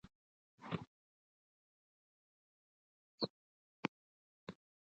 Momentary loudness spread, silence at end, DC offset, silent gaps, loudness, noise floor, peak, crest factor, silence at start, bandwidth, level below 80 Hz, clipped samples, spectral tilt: 17 LU; 0.4 s; under 0.1%; 0.15-0.58 s, 0.87-3.18 s, 3.30-4.47 s; -47 LUFS; under -90 dBFS; -18 dBFS; 34 dB; 0.05 s; 8.2 kHz; -80 dBFS; under 0.1%; -6 dB/octave